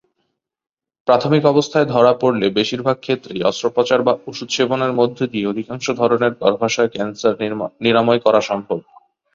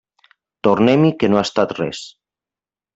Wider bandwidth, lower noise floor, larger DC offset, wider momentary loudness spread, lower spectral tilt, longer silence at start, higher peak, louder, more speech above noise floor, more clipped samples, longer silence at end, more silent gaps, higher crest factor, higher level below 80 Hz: about the same, 7.6 kHz vs 8 kHz; second, -72 dBFS vs under -90 dBFS; neither; second, 9 LU vs 14 LU; second, -5 dB/octave vs -6.5 dB/octave; first, 1.05 s vs 0.65 s; about the same, -2 dBFS vs -2 dBFS; about the same, -17 LUFS vs -17 LUFS; second, 55 dB vs over 74 dB; neither; second, 0.55 s vs 0.85 s; neither; about the same, 16 dB vs 18 dB; about the same, -58 dBFS vs -56 dBFS